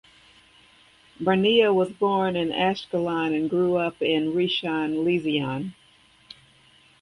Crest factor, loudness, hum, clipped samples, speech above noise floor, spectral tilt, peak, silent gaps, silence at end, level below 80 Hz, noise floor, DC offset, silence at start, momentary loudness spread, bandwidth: 18 dB; -23 LUFS; none; under 0.1%; 34 dB; -7 dB/octave; -6 dBFS; none; 1.3 s; -62 dBFS; -57 dBFS; under 0.1%; 1.2 s; 7 LU; 11 kHz